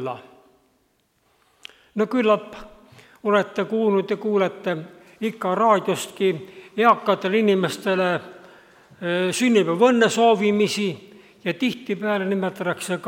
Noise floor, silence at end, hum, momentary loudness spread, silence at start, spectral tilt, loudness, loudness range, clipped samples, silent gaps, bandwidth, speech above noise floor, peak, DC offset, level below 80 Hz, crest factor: -66 dBFS; 0 s; none; 13 LU; 0 s; -5 dB/octave; -21 LUFS; 4 LU; under 0.1%; none; 16.5 kHz; 45 dB; -4 dBFS; under 0.1%; -66 dBFS; 18 dB